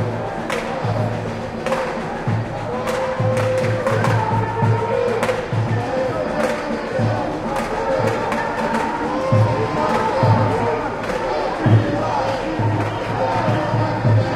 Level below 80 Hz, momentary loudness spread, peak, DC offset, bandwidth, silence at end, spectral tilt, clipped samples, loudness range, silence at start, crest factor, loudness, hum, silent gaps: -42 dBFS; 6 LU; -2 dBFS; under 0.1%; 12.5 kHz; 0 s; -7 dB/octave; under 0.1%; 3 LU; 0 s; 18 dB; -20 LUFS; none; none